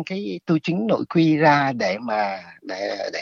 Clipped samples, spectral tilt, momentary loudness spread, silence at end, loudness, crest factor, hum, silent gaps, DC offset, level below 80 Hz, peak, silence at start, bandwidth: under 0.1%; -6.5 dB/octave; 12 LU; 0 s; -21 LUFS; 18 dB; none; none; under 0.1%; -68 dBFS; -4 dBFS; 0 s; 7.2 kHz